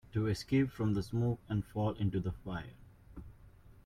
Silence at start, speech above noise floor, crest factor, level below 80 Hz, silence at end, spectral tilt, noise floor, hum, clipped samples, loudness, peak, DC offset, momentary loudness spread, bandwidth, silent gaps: 0.15 s; 24 dB; 16 dB; -54 dBFS; 0.15 s; -7.5 dB/octave; -58 dBFS; none; under 0.1%; -35 LUFS; -20 dBFS; under 0.1%; 21 LU; 13.5 kHz; none